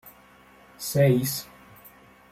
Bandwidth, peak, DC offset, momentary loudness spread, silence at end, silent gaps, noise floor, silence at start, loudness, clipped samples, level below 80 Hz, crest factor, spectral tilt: 16 kHz; -8 dBFS; under 0.1%; 16 LU; 0.45 s; none; -54 dBFS; 0.05 s; -24 LUFS; under 0.1%; -60 dBFS; 20 dB; -5.5 dB/octave